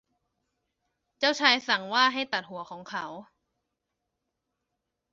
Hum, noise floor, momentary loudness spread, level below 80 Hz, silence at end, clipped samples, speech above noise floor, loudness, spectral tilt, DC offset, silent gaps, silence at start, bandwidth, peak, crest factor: none; -83 dBFS; 18 LU; -78 dBFS; 1.9 s; under 0.1%; 56 dB; -25 LUFS; 1 dB/octave; under 0.1%; none; 1.2 s; 7.6 kHz; -4 dBFS; 26 dB